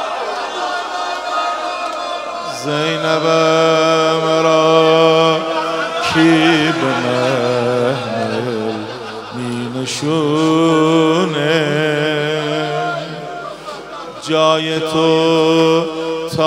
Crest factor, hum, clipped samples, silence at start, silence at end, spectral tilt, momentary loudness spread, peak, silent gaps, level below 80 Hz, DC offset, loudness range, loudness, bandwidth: 16 dB; none; under 0.1%; 0 s; 0 s; -5 dB/octave; 12 LU; 0 dBFS; none; -56 dBFS; under 0.1%; 6 LU; -15 LUFS; 12.5 kHz